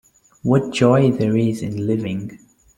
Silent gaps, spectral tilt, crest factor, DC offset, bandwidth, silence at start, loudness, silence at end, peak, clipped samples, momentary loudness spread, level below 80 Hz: none; -7.5 dB/octave; 16 dB; under 0.1%; 12.5 kHz; 0.45 s; -19 LUFS; 0.4 s; -2 dBFS; under 0.1%; 12 LU; -52 dBFS